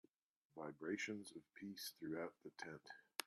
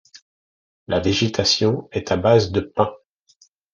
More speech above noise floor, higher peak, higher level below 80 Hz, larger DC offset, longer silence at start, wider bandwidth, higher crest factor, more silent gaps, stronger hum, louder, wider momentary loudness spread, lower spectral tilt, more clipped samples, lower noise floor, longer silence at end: about the same, 37 dB vs 39 dB; second, -26 dBFS vs -2 dBFS; second, under -90 dBFS vs -56 dBFS; neither; first, 0.55 s vs 0.15 s; first, 13.5 kHz vs 9.8 kHz; first, 26 dB vs 18 dB; second, none vs 0.22-0.86 s; neither; second, -51 LUFS vs -20 LUFS; first, 11 LU vs 8 LU; second, -3.5 dB/octave vs -5 dB/octave; neither; first, -88 dBFS vs -58 dBFS; second, 0 s vs 0.8 s